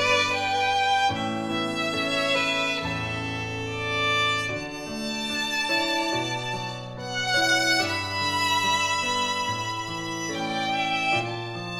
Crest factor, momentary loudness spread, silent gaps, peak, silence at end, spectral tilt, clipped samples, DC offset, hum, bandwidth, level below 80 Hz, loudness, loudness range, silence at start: 16 dB; 9 LU; none; -10 dBFS; 0 s; -3 dB/octave; under 0.1%; under 0.1%; none; 18 kHz; -56 dBFS; -25 LUFS; 2 LU; 0 s